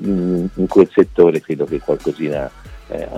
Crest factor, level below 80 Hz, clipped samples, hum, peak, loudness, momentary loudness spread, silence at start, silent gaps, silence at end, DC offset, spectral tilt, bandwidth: 16 dB; -40 dBFS; under 0.1%; none; 0 dBFS; -16 LUFS; 14 LU; 0 s; none; 0 s; under 0.1%; -8.5 dB/octave; 11 kHz